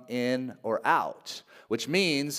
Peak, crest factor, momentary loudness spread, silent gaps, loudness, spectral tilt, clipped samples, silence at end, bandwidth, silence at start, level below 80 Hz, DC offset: -8 dBFS; 20 dB; 15 LU; none; -28 LUFS; -4 dB/octave; under 0.1%; 0 s; 16 kHz; 0 s; -78 dBFS; under 0.1%